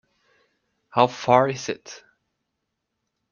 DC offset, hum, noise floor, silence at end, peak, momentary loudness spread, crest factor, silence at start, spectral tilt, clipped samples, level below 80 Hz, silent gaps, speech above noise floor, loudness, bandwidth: under 0.1%; none; -79 dBFS; 1.35 s; -2 dBFS; 21 LU; 24 dB; 0.95 s; -5 dB/octave; under 0.1%; -68 dBFS; none; 58 dB; -21 LUFS; 7.2 kHz